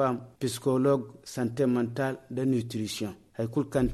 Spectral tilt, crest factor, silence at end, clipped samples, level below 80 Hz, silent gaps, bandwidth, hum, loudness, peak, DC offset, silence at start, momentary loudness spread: -6.5 dB/octave; 16 dB; 0 s; under 0.1%; -52 dBFS; none; 13 kHz; none; -30 LUFS; -12 dBFS; under 0.1%; 0 s; 8 LU